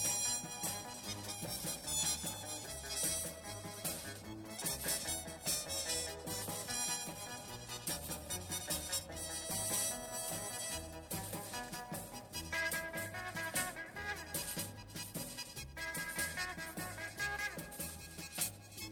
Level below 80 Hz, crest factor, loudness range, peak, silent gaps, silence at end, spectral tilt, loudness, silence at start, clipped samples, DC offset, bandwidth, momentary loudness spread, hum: -60 dBFS; 18 dB; 3 LU; -24 dBFS; none; 0 s; -1.5 dB/octave; -40 LUFS; 0 s; under 0.1%; under 0.1%; 19 kHz; 9 LU; none